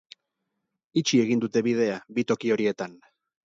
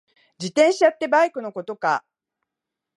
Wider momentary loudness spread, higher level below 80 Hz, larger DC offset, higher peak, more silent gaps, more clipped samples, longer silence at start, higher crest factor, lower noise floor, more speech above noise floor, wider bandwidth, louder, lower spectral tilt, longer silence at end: second, 7 LU vs 14 LU; first, -70 dBFS vs -80 dBFS; neither; second, -10 dBFS vs -4 dBFS; neither; neither; first, 0.95 s vs 0.4 s; about the same, 18 dB vs 18 dB; second, -81 dBFS vs -85 dBFS; second, 56 dB vs 65 dB; second, 7.8 kHz vs 11.5 kHz; second, -25 LUFS vs -20 LUFS; about the same, -5 dB/octave vs -4 dB/octave; second, 0.5 s vs 1 s